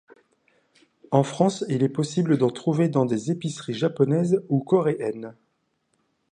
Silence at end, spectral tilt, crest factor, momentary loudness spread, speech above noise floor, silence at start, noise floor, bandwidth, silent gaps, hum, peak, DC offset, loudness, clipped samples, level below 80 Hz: 1 s; -7 dB/octave; 20 dB; 8 LU; 50 dB; 1.1 s; -72 dBFS; 10 kHz; none; none; -4 dBFS; under 0.1%; -23 LUFS; under 0.1%; -70 dBFS